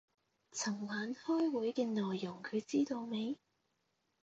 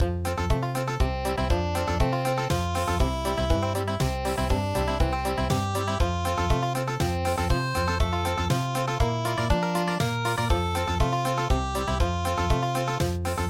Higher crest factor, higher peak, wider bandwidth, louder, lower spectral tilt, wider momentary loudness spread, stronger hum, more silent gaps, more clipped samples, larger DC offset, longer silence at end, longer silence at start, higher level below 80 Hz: about the same, 16 dB vs 16 dB; second, -22 dBFS vs -10 dBFS; second, 8.8 kHz vs 17 kHz; second, -38 LUFS vs -26 LUFS; about the same, -4.5 dB/octave vs -5.5 dB/octave; first, 7 LU vs 2 LU; neither; neither; neither; neither; first, 0.9 s vs 0 s; first, 0.55 s vs 0 s; second, -84 dBFS vs -32 dBFS